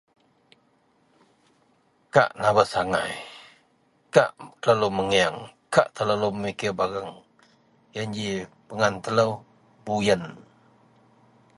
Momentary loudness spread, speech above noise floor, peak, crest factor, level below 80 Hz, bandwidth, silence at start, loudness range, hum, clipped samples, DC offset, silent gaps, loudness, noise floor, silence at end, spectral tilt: 17 LU; 41 dB; -2 dBFS; 24 dB; -60 dBFS; 11.5 kHz; 2.15 s; 4 LU; none; under 0.1%; under 0.1%; none; -24 LUFS; -64 dBFS; 1.15 s; -4.5 dB/octave